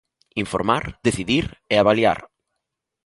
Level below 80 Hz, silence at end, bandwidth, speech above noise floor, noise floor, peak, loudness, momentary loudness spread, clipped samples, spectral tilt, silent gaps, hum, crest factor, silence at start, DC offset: -46 dBFS; 0.8 s; 11.5 kHz; 61 dB; -81 dBFS; -2 dBFS; -21 LUFS; 11 LU; under 0.1%; -5 dB/octave; none; none; 20 dB; 0.35 s; under 0.1%